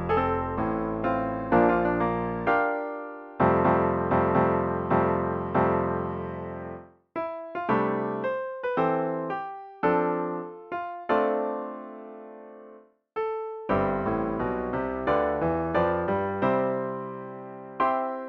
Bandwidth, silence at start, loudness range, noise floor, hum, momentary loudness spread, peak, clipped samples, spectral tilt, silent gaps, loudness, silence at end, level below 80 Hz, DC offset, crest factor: 6 kHz; 0 s; 6 LU; -52 dBFS; none; 15 LU; -8 dBFS; under 0.1%; -10 dB/octave; none; -27 LUFS; 0 s; -50 dBFS; under 0.1%; 18 dB